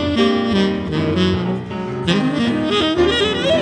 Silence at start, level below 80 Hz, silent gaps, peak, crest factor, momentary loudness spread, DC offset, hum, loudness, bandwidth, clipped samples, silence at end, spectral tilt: 0 s; -40 dBFS; none; -4 dBFS; 14 dB; 7 LU; under 0.1%; none; -17 LUFS; 10 kHz; under 0.1%; 0 s; -6 dB/octave